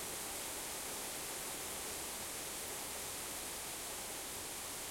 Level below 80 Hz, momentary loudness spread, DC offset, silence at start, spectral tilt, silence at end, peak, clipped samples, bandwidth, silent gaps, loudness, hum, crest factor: -64 dBFS; 1 LU; under 0.1%; 0 s; -1 dB/octave; 0 s; -30 dBFS; under 0.1%; 16.5 kHz; none; -41 LUFS; none; 14 dB